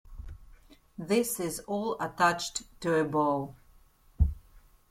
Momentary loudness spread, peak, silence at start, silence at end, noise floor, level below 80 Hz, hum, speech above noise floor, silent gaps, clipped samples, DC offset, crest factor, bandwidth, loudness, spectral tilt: 22 LU; -12 dBFS; 0.05 s; 0.5 s; -60 dBFS; -40 dBFS; none; 30 dB; none; under 0.1%; under 0.1%; 20 dB; 16.5 kHz; -30 LUFS; -4.5 dB/octave